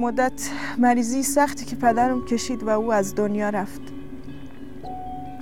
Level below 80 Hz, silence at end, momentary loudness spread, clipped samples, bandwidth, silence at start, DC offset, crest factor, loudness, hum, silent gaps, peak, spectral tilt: -48 dBFS; 0 s; 19 LU; under 0.1%; 17 kHz; 0 s; 2%; 18 dB; -23 LUFS; none; none; -6 dBFS; -4.5 dB/octave